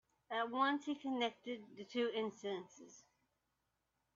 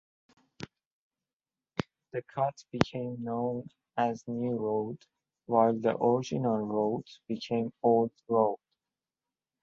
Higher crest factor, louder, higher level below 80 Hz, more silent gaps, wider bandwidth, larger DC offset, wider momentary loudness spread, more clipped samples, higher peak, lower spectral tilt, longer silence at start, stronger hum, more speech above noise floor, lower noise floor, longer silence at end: second, 20 dB vs 30 dB; second, -41 LUFS vs -31 LUFS; second, -88 dBFS vs -66 dBFS; second, none vs 0.86-1.10 s, 1.33-1.40 s; about the same, 7.4 kHz vs 7.4 kHz; neither; about the same, 15 LU vs 13 LU; neither; second, -22 dBFS vs -2 dBFS; second, -1.5 dB/octave vs -7 dB/octave; second, 0.3 s vs 0.6 s; neither; second, 45 dB vs over 60 dB; second, -86 dBFS vs under -90 dBFS; about the same, 1.15 s vs 1.05 s